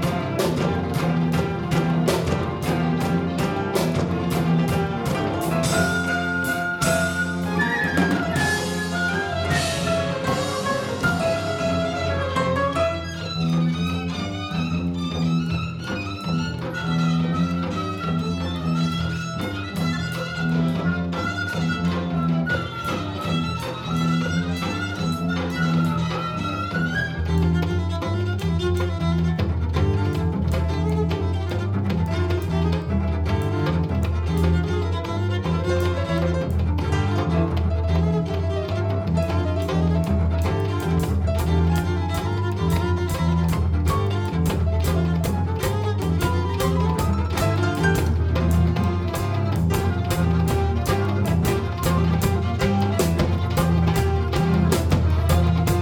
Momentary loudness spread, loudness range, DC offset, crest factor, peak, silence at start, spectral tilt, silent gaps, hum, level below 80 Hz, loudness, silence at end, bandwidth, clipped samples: 5 LU; 3 LU; under 0.1%; 16 dB; -6 dBFS; 0 s; -6.5 dB/octave; none; none; -32 dBFS; -23 LUFS; 0 s; 18.5 kHz; under 0.1%